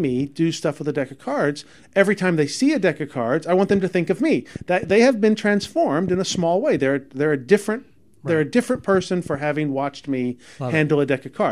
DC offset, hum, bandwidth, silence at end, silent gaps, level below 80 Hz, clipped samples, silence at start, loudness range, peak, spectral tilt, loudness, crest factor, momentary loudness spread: 0.2%; none; 13 kHz; 0 s; none; -56 dBFS; under 0.1%; 0 s; 3 LU; 0 dBFS; -6 dB/octave; -21 LUFS; 20 dB; 7 LU